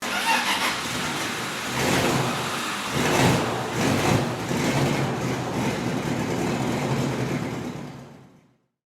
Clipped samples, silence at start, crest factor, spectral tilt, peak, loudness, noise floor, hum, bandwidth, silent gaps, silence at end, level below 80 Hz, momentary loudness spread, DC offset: under 0.1%; 0 s; 18 dB; -4.5 dB/octave; -6 dBFS; -24 LUFS; -59 dBFS; none; 18.5 kHz; none; 0.75 s; -50 dBFS; 7 LU; under 0.1%